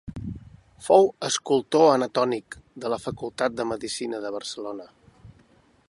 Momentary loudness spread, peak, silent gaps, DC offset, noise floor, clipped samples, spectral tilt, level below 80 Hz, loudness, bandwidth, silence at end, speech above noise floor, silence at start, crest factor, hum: 19 LU; -4 dBFS; none; under 0.1%; -59 dBFS; under 0.1%; -4 dB/octave; -54 dBFS; -24 LUFS; 11.5 kHz; 0.6 s; 35 dB; 0.05 s; 22 dB; none